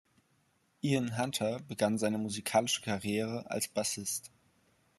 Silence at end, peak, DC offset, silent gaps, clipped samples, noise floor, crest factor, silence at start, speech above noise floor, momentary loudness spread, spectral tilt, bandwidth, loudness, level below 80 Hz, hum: 0.7 s; -14 dBFS; under 0.1%; none; under 0.1%; -73 dBFS; 20 dB; 0.85 s; 39 dB; 6 LU; -4 dB/octave; 13 kHz; -33 LUFS; -74 dBFS; none